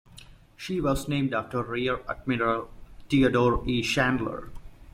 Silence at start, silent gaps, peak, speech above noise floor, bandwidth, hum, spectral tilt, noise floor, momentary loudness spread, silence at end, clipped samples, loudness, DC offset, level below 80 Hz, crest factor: 0.15 s; none; -10 dBFS; 24 dB; 16 kHz; none; -6 dB/octave; -50 dBFS; 11 LU; 0 s; under 0.1%; -26 LUFS; under 0.1%; -44 dBFS; 18 dB